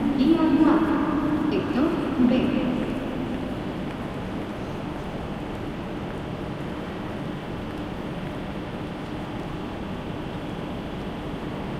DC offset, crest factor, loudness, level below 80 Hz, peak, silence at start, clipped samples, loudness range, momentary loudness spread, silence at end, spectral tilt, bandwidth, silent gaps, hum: under 0.1%; 18 dB; -27 LUFS; -42 dBFS; -8 dBFS; 0 s; under 0.1%; 9 LU; 12 LU; 0 s; -7.5 dB/octave; 13.5 kHz; none; none